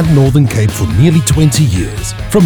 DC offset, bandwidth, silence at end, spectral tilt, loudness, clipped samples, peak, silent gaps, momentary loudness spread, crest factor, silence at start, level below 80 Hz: under 0.1%; over 20 kHz; 0 s; -6 dB/octave; -11 LUFS; under 0.1%; 0 dBFS; none; 7 LU; 10 dB; 0 s; -24 dBFS